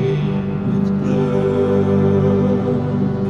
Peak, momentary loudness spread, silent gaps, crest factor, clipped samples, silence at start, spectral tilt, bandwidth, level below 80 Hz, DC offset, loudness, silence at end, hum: -4 dBFS; 4 LU; none; 12 dB; under 0.1%; 0 s; -9.5 dB/octave; 7 kHz; -42 dBFS; under 0.1%; -17 LUFS; 0 s; 50 Hz at -35 dBFS